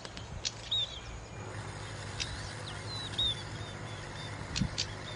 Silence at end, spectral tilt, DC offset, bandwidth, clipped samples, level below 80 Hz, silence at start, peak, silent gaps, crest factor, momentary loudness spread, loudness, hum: 0 s; -3 dB/octave; under 0.1%; 10 kHz; under 0.1%; -50 dBFS; 0 s; -16 dBFS; none; 22 dB; 11 LU; -37 LUFS; none